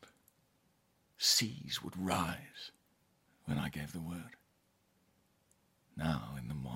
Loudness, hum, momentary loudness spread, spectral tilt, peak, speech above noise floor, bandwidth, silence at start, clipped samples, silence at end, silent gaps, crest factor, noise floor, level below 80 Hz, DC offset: -36 LUFS; none; 21 LU; -3 dB/octave; -16 dBFS; 35 dB; 16.5 kHz; 0 s; under 0.1%; 0 s; none; 24 dB; -75 dBFS; -62 dBFS; under 0.1%